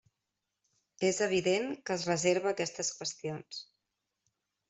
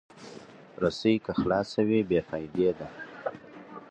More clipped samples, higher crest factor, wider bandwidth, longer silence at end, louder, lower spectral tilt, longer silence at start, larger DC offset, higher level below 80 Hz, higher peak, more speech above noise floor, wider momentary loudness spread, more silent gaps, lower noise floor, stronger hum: neither; about the same, 20 dB vs 18 dB; about the same, 8.2 kHz vs 8.8 kHz; first, 1.05 s vs 0.05 s; second, -32 LUFS vs -28 LUFS; second, -3.5 dB/octave vs -7 dB/octave; first, 1 s vs 0.15 s; neither; second, -74 dBFS vs -56 dBFS; second, -14 dBFS vs -10 dBFS; first, 54 dB vs 21 dB; second, 12 LU vs 21 LU; neither; first, -87 dBFS vs -48 dBFS; neither